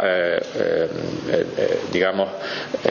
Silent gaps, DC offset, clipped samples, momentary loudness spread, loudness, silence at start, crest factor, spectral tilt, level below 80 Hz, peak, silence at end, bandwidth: none; under 0.1%; under 0.1%; 6 LU; -22 LUFS; 0 s; 22 dB; -5.5 dB/octave; -56 dBFS; 0 dBFS; 0 s; 7.2 kHz